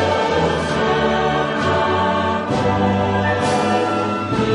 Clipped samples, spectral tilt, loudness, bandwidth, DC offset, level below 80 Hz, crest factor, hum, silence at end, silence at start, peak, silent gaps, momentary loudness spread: under 0.1%; -6 dB/octave; -18 LUFS; 11.5 kHz; under 0.1%; -40 dBFS; 12 dB; none; 0 s; 0 s; -4 dBFS; none; 2 LU